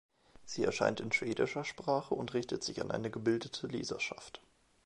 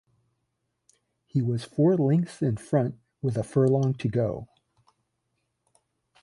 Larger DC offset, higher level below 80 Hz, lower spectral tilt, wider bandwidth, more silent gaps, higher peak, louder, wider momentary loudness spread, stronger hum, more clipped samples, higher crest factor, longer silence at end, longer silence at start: neither; second, -66 dBFS vs -60 dBFS; second, -4.5 dB/octave vs -8.5 dB/octave; about the same, 11.5 kHz vs 11.5 kHz; neither; second, -16 dBFS vs -10 dBFS; second, -36 LUFS vs -26 LUFS; about the same, 8 LU vs 9 LU; neither; neither; about the same, 22 dB vs 18 dB; second, 0.5 s vs 1.75 s; second, 0.4 s vs 1.35 s